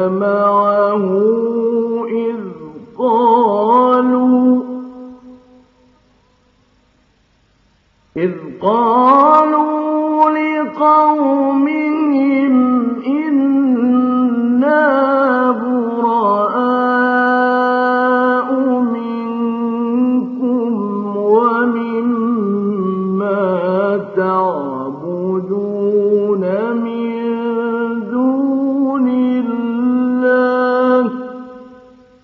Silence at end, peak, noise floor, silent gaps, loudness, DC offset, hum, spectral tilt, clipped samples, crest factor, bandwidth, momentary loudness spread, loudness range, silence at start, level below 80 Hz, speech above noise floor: 0.5 s; 0 dBFS; -56 dBFS; none; -14 LUFS; under 0.1%; none; -5.5 dB/octave; under 0.1%; 14 dB; 4.8 kHz; 8 LU; 4 LU; 0 s; -64 dBFS; 44 dB